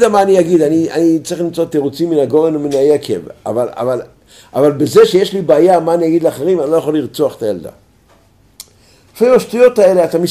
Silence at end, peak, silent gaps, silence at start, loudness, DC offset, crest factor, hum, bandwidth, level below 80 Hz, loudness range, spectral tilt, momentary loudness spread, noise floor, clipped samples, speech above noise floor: 0 s; 0 dBFS; none; 0 s; -12 LUFS; under 0.1%; 12 dB; none; 15.5 kHz; -54 dBFS; 4 LU; -6 dB/octave; 10 LU; -49 dBFS; under 0.1%; 37 dB